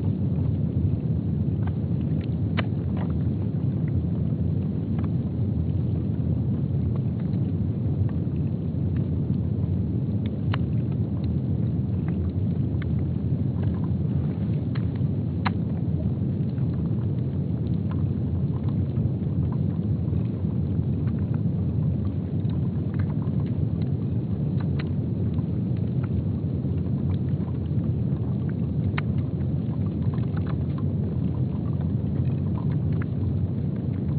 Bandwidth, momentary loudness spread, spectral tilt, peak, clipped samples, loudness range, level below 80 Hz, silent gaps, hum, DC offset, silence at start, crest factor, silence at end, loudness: 4.5 kHz; 2 LU; -10 dB/octave; -8 dBFS; under 0.1%; 1 LU; -40 dBFS; none; none; under 0.1%; 0 s; 16 dB; 0 s; -26 LUFS